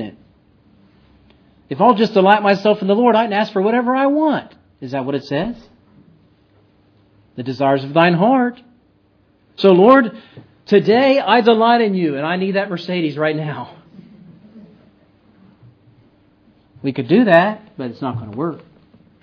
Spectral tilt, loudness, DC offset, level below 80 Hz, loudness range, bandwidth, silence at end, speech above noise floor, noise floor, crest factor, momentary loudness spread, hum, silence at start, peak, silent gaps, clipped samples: -8 dB/octave; -15 LUFS; under 0.1%; -60 dBFS; 11 LU; 5.4 kHz; 0.65 s; 41 dB; -56 dBFS; 18 dB; 15 LU; none; 0 s; 0 dBFS; none; under 0.1%